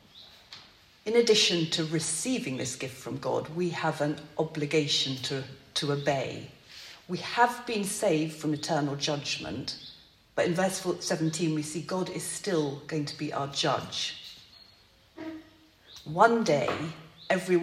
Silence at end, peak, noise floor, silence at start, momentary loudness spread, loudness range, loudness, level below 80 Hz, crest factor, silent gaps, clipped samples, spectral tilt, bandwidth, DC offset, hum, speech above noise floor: 0 s; -6 dBFS; -60 dBFS; 0.15 s; 18 LU; 4 LU; -29 LUFS; -68 dBFS; 24 dB; none; under 0.1%; -4 dB/octave; 16 kHz; under 0.1%; none; 31 dB